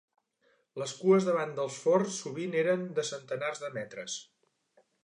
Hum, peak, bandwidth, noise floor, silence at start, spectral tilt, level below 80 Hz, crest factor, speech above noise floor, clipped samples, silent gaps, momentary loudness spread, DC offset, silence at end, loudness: none; -14 dBFS; 11 kHz; -72 dBFS; 0.75 s; -5 dB/octave; -84 dBFS; 18 dB; 41 dB; under 0.1%; none; 13 LU; under 0.1%; 0.8 s; -31 LUFS